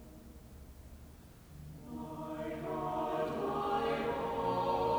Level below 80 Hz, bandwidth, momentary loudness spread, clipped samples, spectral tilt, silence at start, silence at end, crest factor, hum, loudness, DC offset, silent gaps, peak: -56 dBFS; over 20 kHz; 21 LU; under 0.1%; -6.5 dB/octave; 0 s; 0 s; 16 dB; none; -36 LUFS; under 0.1%; none; -22 dBFS